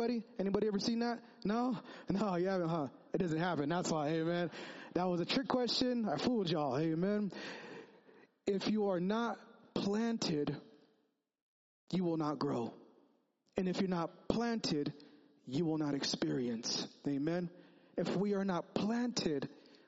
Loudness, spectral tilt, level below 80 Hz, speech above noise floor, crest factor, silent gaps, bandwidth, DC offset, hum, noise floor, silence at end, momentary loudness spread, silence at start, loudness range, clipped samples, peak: -37 LUFS; -5 dB/octave; -70 dBFS; 43 dB; 22 dB; 11.42-11.87 s; 7.6 kHz; under 0.1%; none; -79 dBFS; 0.3 s; 8 LU; 0 s; 4 LU; under 0.1%; -14 dBFS